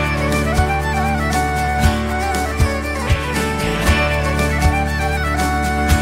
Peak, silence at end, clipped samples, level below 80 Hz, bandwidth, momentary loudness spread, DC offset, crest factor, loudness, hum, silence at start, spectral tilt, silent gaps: -2 dBFS; 0 s; under 0.1%; -22 dBFS; 16 kHz; 3 LU; under 0.1%; 14 dB; -18 LUFS; none; 0 s; -5 dB/octave; none